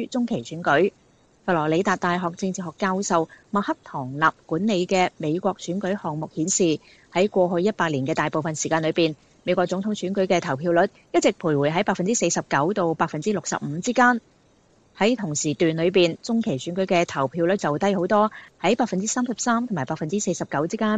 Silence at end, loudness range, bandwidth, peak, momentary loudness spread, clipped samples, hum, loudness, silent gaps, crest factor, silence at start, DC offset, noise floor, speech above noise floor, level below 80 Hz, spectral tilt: 0 s; 2 LU; 9.4 kHz; -4 dBFS; 6 LU; under 0.1%; none; -23 LUFS; none; 18 dB; 0 s; under 0.1%; -59 dBFS; 36 dB; -62 dBFS; -4.5 dB/octave